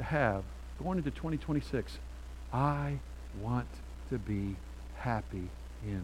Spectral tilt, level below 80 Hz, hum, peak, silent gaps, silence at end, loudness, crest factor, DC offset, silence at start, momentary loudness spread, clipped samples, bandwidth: -7.5 dB/octave; -44 dBFS; none; -14 dBFS; none; 0 s; -37 LUFS; 22 dB; under 0.1%; 0 s; 14 LU; under 0.1%; 15.5 kHz